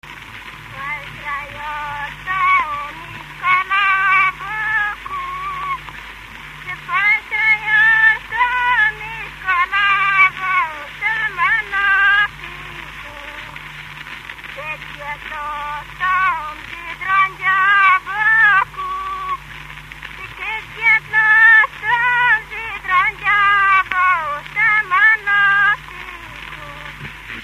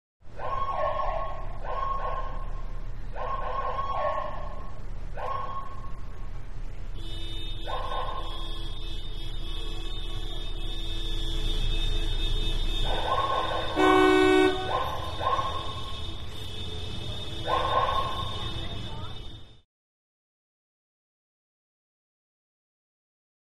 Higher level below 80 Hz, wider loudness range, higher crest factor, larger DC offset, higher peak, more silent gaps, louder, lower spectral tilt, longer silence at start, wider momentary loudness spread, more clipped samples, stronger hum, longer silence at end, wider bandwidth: second, -46 dBFS vs -34 dBFS; second, 8 LU vs 13 LU; about the same, 18 dB vs 20 dB; second, under 0.1% vs 2%; first, 0 dBFS vs -10 dBFS; neither; first, -15 LUFS vs -30 LUFS; second, -2.5 dB/octave vs -5.5 dB/octave; second, 0.05 s vs 0.2 s; first, 19 LU vs 16 LU; neither; neither; second, 0 s vs 3.8 s; first, 15 kHz vs 12.5 kHz